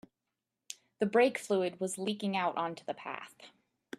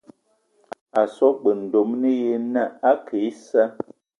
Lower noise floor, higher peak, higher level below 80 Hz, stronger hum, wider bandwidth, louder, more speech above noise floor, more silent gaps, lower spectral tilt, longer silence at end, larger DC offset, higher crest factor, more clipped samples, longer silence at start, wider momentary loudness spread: first, -88 dBFS vs -65 dBFS; second, -14 dBFS vs -4 dBFS; second, -82 dBFS vs -74 dBFS; neither; first, 13.5 kHz vs 10.5 kHz; second, -33 LUFS vs -21 LUFS; first, 55 dB vs 45 dB; neither; second, -4.5 dB/octave vs -7 dB/octave; about the same, 0.5 s vs 0.45 s; neither; about the same, 20 dB vs 18 dB; neither; second, 0.7 s vs 0.95 s; first, 20 LU vs 7 LU